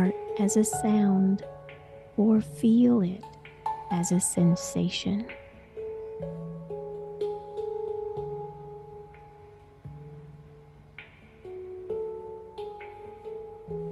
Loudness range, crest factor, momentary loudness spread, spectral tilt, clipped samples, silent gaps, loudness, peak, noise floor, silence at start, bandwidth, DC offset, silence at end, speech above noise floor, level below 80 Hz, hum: 17 LU; 18 dB; 23 LU; -6 dB/octave; under 0.1%; none; -28 LUFS; -12 dBFS; -52 dBFS; 0 s; 12.5 kHz; under 0.1%; 0 s; 27 dB; -58 dBFS; none